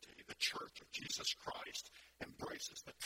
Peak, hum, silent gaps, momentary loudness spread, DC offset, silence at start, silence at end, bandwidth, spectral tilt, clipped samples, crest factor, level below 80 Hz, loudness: -24 dBFS; none; none; 13 LU; under 0.1%; 0 s; 0 s; 16 kHz; -0.5 dB/octave; under 0.1%; 24 dB; -74 dBFS; -44 LUFS